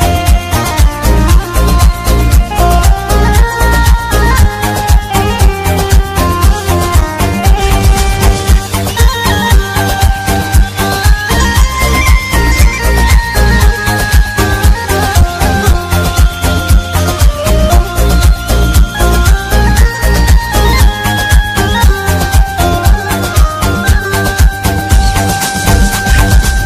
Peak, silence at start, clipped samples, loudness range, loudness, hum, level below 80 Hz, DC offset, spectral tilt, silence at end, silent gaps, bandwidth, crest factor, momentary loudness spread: 0 dBFS; 0 s; 0.3%; 1 LU; -10 LUFS; none; -10 dBFS; under 0.1%; -4.5 dB/octave; 0 s; none; 16 kHz; 8 dB; 3 LU